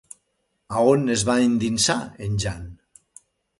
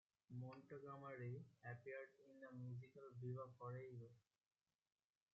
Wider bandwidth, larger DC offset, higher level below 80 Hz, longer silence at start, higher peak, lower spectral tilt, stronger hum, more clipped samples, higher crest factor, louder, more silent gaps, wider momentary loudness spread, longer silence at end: first, 11.5 kHz vs 7 kHz; neither; first, -46 dBFS vs under -90 dBFS; first, 0.7 s vs 0.3 s; first, -4 dBFS vs -42 dBFS; second, -4.5 dB/octave vs -8 dB/octave; neither; neither; about the same, 20 dB vs 16 dB; first, -21 LUFS vs -56 LUFS; neither; first, 11 LU vs 8 LU; second, 0.85 s vs 1.15 s